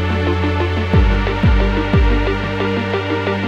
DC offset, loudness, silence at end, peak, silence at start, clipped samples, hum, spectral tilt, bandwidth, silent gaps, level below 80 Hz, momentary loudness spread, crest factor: under 0.1%; -17 LUFS; 0 s; -2 dBFS; 0 s; under 0.1%; none; -7.5 dB/octave; 7.4 kHz; none; -20 dBFS; 4 LU; 14 dB